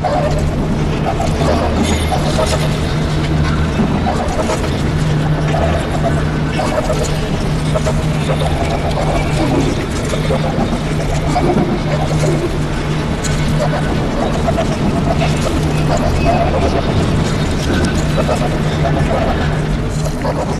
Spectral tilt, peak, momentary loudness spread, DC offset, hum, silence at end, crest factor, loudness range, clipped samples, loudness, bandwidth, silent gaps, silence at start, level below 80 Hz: -6 dB/octave; -2 dBFS; 3 LU; under 0.1%; none; 0 s; 12 dB; 1 LU; under 0.1%; -16 LUFS; 13 kHz; none; 0 s; -22 dBFS